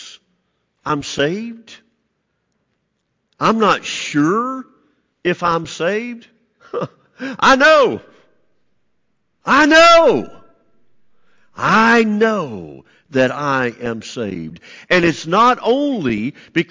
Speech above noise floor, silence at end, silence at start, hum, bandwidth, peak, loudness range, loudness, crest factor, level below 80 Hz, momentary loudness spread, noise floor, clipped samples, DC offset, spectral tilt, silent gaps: 54 dB; 0.05 s; 0 s; none; 7.6 kHz; -4 dBFS; 8 LU; -15 LUFS; 14 dB; -52 dBFS; 20 LU; -70 dBFS; under 0.1%; under 0.1%; -4.5 dB/octave; none